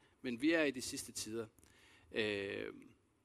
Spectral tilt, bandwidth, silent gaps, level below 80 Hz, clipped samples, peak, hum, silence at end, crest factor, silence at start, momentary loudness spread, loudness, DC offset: -3.5 dB/octave; 14 kHz; none; -72 dBFS; under 0.1%; -20 dBFS; none; 0.35 s; 22 dB; 0.25 s; 14 LU; -39 LUFS; under 0.1%